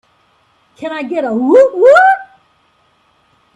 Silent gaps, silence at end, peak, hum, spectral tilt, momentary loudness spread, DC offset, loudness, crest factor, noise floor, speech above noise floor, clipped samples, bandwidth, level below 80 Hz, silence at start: none; 1.3 s; 0 dBFS; none; -5 dB/octave; 16 LU; under 0.1%; -10 LUFS; 14 dB; -55 dBFS; 46 dB; under 0.1%; 9 kHz; -62 dBFS; 0.8 s